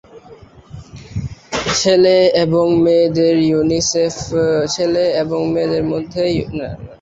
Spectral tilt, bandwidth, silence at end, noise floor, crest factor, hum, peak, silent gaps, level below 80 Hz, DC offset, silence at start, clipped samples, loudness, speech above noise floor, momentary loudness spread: -5 dB/octave; 8 kHz; 0.05 s; -41 dBFS; 14 dB; none; -2 dBFS; none; -42 dBFS; under 0.1%; 0.15 s; under 0.1%; -15 LUFS; 27 dB; 15 LU